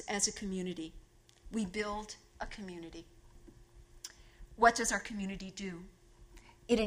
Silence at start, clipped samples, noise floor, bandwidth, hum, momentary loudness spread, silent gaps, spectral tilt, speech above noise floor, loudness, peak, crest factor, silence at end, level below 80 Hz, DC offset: 0 s; under 0.1%; -58 dBFS; 15.5 kHz; none; 22 LU; none; -3 dB/octave; 22 dB; -35 LUFS; -12 dBFS; 26 dB; 0 s; -56 dBFS; under 0.1%